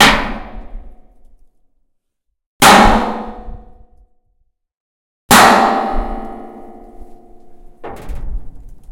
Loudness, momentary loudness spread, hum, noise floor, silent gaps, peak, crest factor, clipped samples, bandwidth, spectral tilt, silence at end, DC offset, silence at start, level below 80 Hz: -10 LUFS; 27 LU; none; -71 dBFS; 2.46-2.60 s, 4.77-5.29 s; 0 dBFS; 16 dB; 0.3%; over 20 kHz; -3 dB/octave; 0 s; under 0.1%; 0 s; -28 dBFS